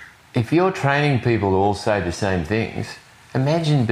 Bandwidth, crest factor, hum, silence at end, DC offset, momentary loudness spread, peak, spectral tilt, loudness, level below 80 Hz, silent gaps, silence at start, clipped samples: 12 kHz; 16 dB; none; 0 s; under 0.1%; 9 LU; -4 dBFS; -6.5 dB/octave; -20 LUFS; -46 dBFS; none; 0 s; under 0.1%